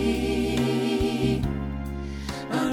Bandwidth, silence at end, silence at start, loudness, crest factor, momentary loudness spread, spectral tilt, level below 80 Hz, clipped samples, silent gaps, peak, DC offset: 17 kHz; 0 s; 0 s; -27 LUFS; 14 dB; 9 LU; -6 dB/octave; -36 dBFS; under 0.1%; none; -12 dBFS; under 0.1%